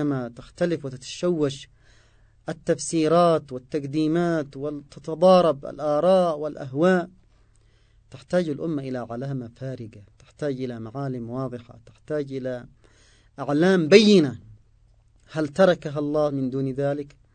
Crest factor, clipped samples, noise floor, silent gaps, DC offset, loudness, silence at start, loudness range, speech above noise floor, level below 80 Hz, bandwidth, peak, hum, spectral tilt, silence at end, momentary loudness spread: 24 dB; under 0.1%; -58 dBFS; none; under 0.1%; -23 LUFS; 0 s; 11 LU; 35 dB; -58 dBFS; 9.4 kHz; 0 dBFS; none; -6 dB/octave; 0.25 s; 17 LU